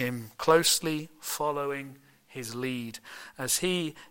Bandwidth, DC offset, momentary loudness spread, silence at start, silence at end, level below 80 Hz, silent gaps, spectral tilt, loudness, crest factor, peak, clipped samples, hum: 17 kHz; under 0.1%; 19 LU; 0 s; 0.05 s; -64 dBFS; none; -3 dB/octave; -28 LUFS; 22 dB; -8 dBFS; under 0.1%; none